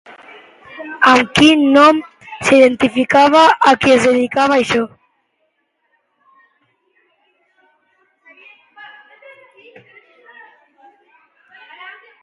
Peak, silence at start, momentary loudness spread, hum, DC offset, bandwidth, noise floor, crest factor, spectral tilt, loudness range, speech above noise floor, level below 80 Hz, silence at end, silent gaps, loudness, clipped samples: 0 dBFS; 0.75 s; 23 LU; none; under 0.1%; 11.5 kHz; -67 dBFS; 16 dB; -4 dB/octave; 11 LU; 56 dB; -52 dBFS; 0.3 s; none; -11 LUFS; under 0.1%